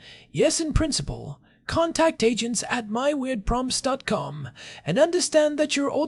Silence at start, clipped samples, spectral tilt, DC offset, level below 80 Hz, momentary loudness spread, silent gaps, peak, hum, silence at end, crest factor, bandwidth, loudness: 0.05 s; under 0.1%; -4 dB/octave; under 0.1%; -40 dBFS; 14 LU; none; -6 dBFS; none; 0 s; 18 dB; 12 kHz; -24 LUFS